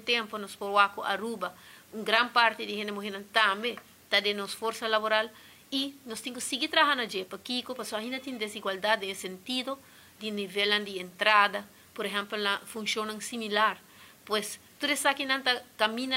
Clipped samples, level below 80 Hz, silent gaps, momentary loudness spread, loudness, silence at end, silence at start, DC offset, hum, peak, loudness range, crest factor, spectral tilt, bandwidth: under 0.1%; -78 dBFS; none; 13 LU; -29 LUFS; 0 s; 0 s; under 0.1%; none; -6 dBFS; 4 LU; 24 dB; -2 dB/octave; 16 kHz